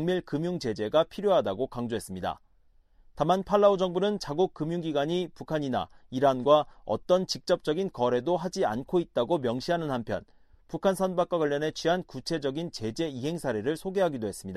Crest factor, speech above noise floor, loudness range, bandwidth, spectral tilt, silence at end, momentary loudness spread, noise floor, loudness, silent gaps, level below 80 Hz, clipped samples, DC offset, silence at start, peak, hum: 20 dB; 33 dB; 3 LU; 14.5 kHz; -6 dB/octave; 0 s; 9 LU; -61 dBFS; -28 LUFS; none; -58 dBFS; under 0.1%; under 0.1%; 0 s; -8 dBFS; none